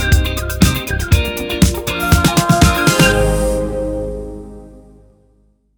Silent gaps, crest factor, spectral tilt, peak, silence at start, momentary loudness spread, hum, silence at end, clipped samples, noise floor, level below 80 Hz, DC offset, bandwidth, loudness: none; 16 dB; -4.5 dB/octave; 0 dBFS; 0 s; 13 LU; none; 0.95 s; under 0.1%; -55 dBFS; -22 dBFS; under 0.1%; over 20 kHz; -15 LUFS